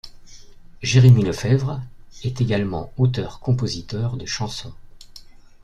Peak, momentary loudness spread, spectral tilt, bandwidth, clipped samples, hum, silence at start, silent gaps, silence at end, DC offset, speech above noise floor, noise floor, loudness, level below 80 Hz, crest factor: -2 dBFS; 17 LU; -6 dB/octave; 9.2 kHz; under 0.1%; none; 0.05 s; none; 0.45 s; under 0.1%; 23 dB; -42 dBFS; -21 LUFS; -44 dBFS; 18 dB